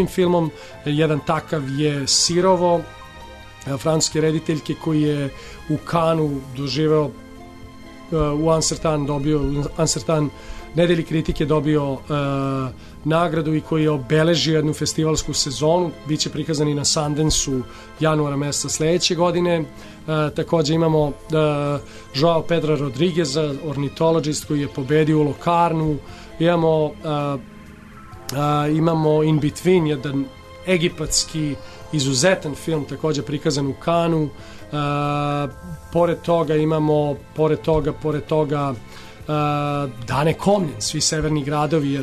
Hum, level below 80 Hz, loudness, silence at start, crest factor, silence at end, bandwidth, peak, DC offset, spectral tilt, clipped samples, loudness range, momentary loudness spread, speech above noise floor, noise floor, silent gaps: none; -40 dBFS; -20 LUFS; 0 s; 16 dB; 0 s; 13.5 kHz; -4 dBFS; under 0.1%; -5 dB/octave; under 0.1%; 2 LU; 10 LU; 21 dB; -40 dBFS; none